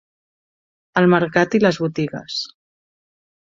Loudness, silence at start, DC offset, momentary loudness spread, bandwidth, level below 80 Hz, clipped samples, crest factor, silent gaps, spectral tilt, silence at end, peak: -19 LUFS; 0.95 s; under 0.1%; 11 LU; 7.6 kHz; -60 dBFS; under 0.1%; 20 dB; none; -6 dB/octave; 0.95 s; -2 dBFS